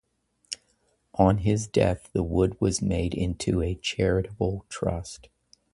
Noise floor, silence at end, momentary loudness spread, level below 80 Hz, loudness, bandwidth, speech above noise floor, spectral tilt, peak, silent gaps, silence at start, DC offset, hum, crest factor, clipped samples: -69 dBFS; 0.6 s; 15 LU; -40 dBFS; -26 LUFS; 11.5 kHz; 44 dB; -6 dB/octave; -6 dBFS; none; 0.5 s; under 0.1%; none; 20 dB; under 0.1%